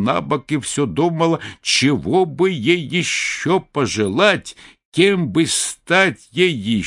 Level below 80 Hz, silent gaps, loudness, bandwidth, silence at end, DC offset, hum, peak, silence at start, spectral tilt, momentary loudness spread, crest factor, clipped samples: -54 dBFS; 4.85-4.92 s; -17 LUFS; 11.5 kHz; 0 s; under 0.1%; none; 0 dBFS; 0 s; -4 dB/octave; 6 LU; 18 dB; under 0.1%